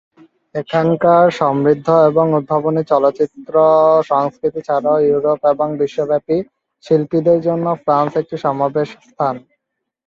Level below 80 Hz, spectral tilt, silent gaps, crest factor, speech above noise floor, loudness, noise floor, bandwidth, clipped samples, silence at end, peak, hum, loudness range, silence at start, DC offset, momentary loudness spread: -58 dBFS; -8.5 dB/octave; none; 14 dB; 62 dB; -15 LUFS; -77 dBFS; 7.4 kHz; under 0.1%; 0.7 s; 0 dBFS; none; 4 LU; 0.55 s; under 0.1%; 9 LU